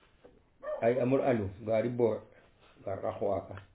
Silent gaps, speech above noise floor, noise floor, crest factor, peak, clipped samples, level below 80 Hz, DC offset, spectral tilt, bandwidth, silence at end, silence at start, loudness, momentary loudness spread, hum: none; 30 dB; -61 dBFS; 18 dB; -14 dBFS; under 0.1%; -60 dBFS; under 0.1%; -7.5 dB/octave; 4 kHz; 0.1 s; 0.65 s; -32 LUFS; 13 LU; none